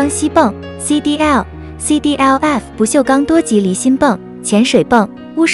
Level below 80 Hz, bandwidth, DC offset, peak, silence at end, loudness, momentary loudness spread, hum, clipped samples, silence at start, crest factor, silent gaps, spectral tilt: -38 dBFS; 12 kHz; under 0.1%; 0 dBFS; 0 s; -13 LUFS; 5 LU; none; 0.2%; 0 s; 12 dB; none; -4.5 dB/octave